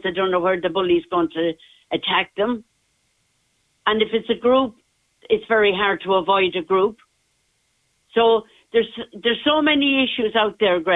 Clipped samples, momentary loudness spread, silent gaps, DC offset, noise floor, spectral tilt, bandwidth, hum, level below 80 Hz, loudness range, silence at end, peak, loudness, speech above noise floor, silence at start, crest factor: under 0.1%; 8 LU; none; under 0.1%; -67 dBFS; -6.5 dB/octave; 4 kHz; none; -58 dBFS; 4 LU; 0 s; -4 dBFS; -20 LUFS; 47 dB; 0.05 s; 16 dB